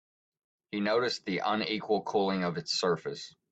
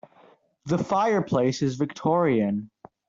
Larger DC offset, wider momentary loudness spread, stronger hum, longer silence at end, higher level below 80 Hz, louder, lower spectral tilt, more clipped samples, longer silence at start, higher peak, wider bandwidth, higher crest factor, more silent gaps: neither; about the same, 7 LU vs 7 LU; neither; second, 0.2 s vs 0.45 s; second, -74 dBFS vs -62 dBFS; second, -31 LUFS vs -24 LUFS; second, -4.5 dB/octave vs -7 dB/octave; neither; about the same, 0.7 s vs 0.65 s; second, -16 dBFS vs -10 dBFS; first, 9 kHz vs 7.6 kHz; about the same, 16 dB vs 14 dB; neither